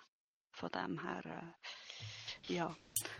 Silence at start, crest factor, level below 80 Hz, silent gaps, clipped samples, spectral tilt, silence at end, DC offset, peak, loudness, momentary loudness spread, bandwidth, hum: 0 s; 28 dB; -76 dBFS; 0.08-0.50 s; under 0.1%; -3.5 dB/octave; 0 s; under 0.1%; -18 dBFS; -44 LUFS; 9 LU; 12 kHz; none